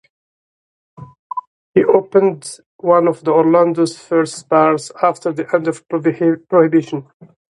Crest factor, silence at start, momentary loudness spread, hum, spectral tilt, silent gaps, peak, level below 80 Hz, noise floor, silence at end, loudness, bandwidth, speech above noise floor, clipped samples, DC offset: 16 dB; 1 s; 15 LU; none; -6.5 dB/octave; 1.19-1.30 s, 1.47-1.74 s, 2.66-2.79 s; 0 dBFS; -62 dBFS; under -90 dBFS; 0.55 s; -15 LUFS; 11.5 kHz; over 75 dB; under 0.1%; under 0.1%